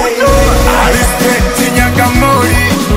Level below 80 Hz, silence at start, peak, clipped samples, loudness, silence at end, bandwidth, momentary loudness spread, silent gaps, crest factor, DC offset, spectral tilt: -16 dBFS; 0 s; 0 dBFS; 0.4%; -9 LUFS; 0 s; 16.5 kHz; 2 LU; none; 8 dB; under 0.1%; -4.5 dB/octave